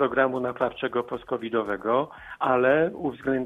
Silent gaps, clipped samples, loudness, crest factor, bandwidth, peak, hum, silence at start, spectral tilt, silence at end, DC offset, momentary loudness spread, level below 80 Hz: none; under 0.1%; -26 LUFS; 18 dB; 4 kHz; -8 dBFS; none; 0 s; -7.5 dB/octave; 0 s; under 0.1%; 9 LU; -58 dBFS